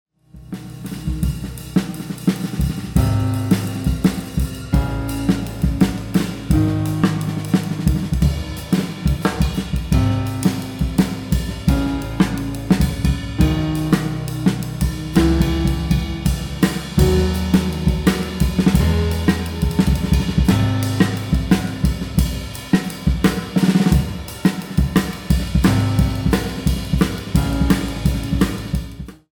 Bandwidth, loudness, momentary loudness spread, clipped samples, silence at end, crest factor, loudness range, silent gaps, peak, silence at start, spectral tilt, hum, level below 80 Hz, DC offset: over 20 kHz; -19 LUFS; 7 LU; under 0.1%; 0.2 s; 16 dB; 2 LU; none; -2 dBFS; 0.35 s; -6.5 dB/octave; none; -26 dBFS; under 0.1%